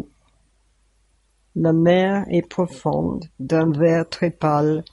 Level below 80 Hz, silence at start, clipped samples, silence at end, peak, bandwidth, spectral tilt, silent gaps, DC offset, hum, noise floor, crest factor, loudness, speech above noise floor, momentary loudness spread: -52 dBFS; 1.55 s; under 0.1%; 0.1 s; -4 dBFS; 11 kHz; -8 dB/octave; none; under 0.1%; none; -62 dBFS; 18 dB; -20 LUFS; 43 dB; 10 LU